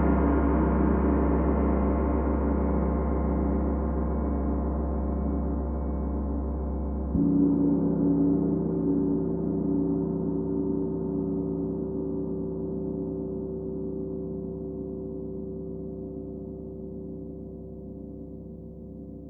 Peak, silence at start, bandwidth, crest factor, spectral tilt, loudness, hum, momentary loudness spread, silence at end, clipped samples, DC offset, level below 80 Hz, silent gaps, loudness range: -12 dBFS; 0 s; 2.7 kHz; 14 dB; -13.5 dB/octave; -28 LUFS; none; 15 LU; 0 s; under 0.1%; under 0.1%; -34 dBFS; none; 11 LU